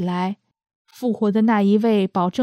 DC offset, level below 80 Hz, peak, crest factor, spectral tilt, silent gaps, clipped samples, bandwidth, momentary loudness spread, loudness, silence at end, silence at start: under 0.1%; -68 dBFS; -6 dBFS; 14 dB; -8 dB/octave; 0.75-0.85 s; under 0.1%; 9.8 kHz; 11 LU; -20 LUFS; 0 s; 0 s